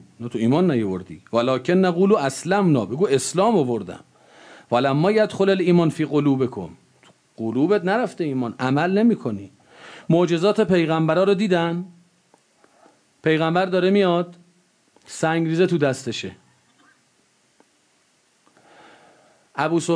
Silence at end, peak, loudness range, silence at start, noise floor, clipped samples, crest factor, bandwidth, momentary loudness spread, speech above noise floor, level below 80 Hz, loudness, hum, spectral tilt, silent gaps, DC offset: 0 s; -6 dBFS; 5 LU; 0.2 s; -62 dBFS; under 0.1%; 16 dB; 11 kHz; 13 LU; 43 dB; -66 dBFS; -20 LUFS; none; -6.5 dB/octave; none; under 0.1%